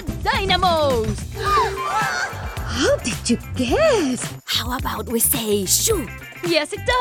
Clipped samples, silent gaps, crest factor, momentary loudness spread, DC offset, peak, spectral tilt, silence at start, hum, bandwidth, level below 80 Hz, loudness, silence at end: under 0.1%; none; 18 dB; 9 LU; under 0.1%; -2 dBFS; -3 dB/octave; 0 s; none; 17 kHz; -34 dBFS; -20 LUFS; 0 s